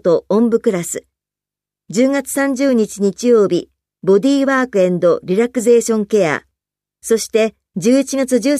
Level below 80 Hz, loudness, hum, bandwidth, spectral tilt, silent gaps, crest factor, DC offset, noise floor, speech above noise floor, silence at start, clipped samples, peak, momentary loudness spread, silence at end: -58 dBFS; -15 LUFS; 50 Hz at -45 dBFS; 15 kHz; -5 dB/octave; none; 14 dB; under 0.1%; -87 dBFS; 73 dB; 0.05 s; under 0.1%; -2 dBFS; 8 LU; 0 s